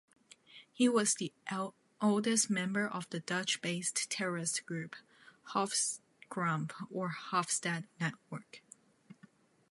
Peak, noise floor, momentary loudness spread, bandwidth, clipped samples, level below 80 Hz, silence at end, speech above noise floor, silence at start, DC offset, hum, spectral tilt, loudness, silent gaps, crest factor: -16 dBFS; -64 dBFS; 17 LU; 11.5 kHz; under 0.1%; -86 dBFS; 0.6 s; 29 dB; 0.5 s; under 0.1%; none; -3.5 dB/octave; -34 LUFS; none; 22 dB